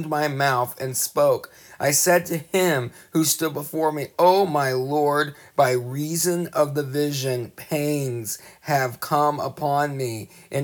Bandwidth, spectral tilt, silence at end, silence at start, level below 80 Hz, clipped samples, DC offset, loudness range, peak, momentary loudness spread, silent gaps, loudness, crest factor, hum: over 20 kHz; -4 dB/octave; 0 s; 0 s; -68 dBFS; under 0.1%; under 0.1%; 4 LU; -6 dBFS; 9 LU; none; -22 LUFS; 18 dB; none